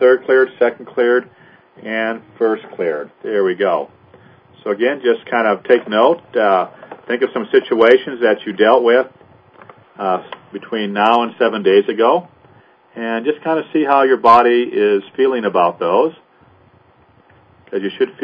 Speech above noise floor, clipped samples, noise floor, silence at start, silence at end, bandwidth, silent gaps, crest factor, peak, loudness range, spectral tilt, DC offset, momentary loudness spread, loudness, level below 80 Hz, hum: 36 dB; under 0.1%; -51 dBFS; 0 s; 0 s; 5.2 kHz; none; 16 dB; 0 dBFS; 5 LU; -7 dB/octave; under 0.1%; 12 LU; -15 LUFS; -66 dBFS; none